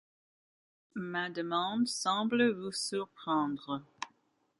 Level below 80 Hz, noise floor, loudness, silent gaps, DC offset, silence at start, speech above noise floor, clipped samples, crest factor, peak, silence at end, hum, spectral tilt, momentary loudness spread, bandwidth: -78 dBFS; -74 dBFS; -33 LUFS; none; under 0.1%; 0.95 s; 41 dB; under 0.1%; 18 dB; -16 dBFS; 0.55 s; none; -3.5 dB/octave; 15 LU; 11.5 kHz